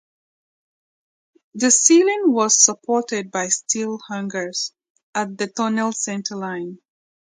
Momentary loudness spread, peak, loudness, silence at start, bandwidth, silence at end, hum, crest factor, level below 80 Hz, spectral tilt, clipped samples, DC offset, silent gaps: 15 LU; 0 dBFS; -19 LUFS; 1.55 s; 10 kHz; 0.6 s; none; 22 dB; -74 dBFS; -2 dB/octave; under 0.1%; under 0.1%; 4.90-4.95 s, 5.03-5.13 s